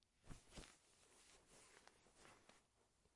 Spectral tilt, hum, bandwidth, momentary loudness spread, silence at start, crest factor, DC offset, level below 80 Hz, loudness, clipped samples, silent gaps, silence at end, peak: -3 dB/octave; none; 12 kHz; 7 LU; 0 s; 24 dB; under 0.1%; -72 dBFS; -66 LUFS; under 0.1%; none; 0 s; -44 dBFS